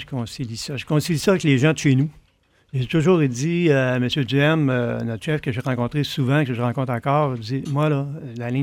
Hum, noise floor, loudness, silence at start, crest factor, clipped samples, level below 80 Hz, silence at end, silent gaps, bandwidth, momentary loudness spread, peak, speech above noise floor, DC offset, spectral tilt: none; -60 dBFS; -21 LUFS; 0 s; 14 dB; under 0.1%; -52 dBFS; 0 s; none; 16.5 kHz; 10 LU; -6 dBFS; 40 dB; under 0.1%; -6.5 dB/octave